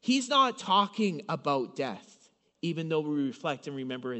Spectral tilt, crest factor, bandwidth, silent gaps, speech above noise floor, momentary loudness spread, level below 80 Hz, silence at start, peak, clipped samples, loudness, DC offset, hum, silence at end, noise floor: -4.5 dB/octave; 20 dB; 8.2 kHz; none; 34 dB; 11 LU; -82 dBFS; 0.05 s; -12 dBFS; under 0.1%; -30 LUFS; under 0.1%; none; 0 s; -64 dBFS